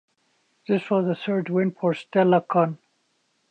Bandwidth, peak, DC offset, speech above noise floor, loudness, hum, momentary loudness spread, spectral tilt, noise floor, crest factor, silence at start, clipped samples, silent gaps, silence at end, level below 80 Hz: 8.4 kHz; -6 dBFS; under 0.1%; 48 dB; -23 LUFS; none; 7 LU; -8.5 dB/octave; -70 dBFS; 18 dB; 0.7 s; under 0.1%; none; 0.75 s; -76 dBFS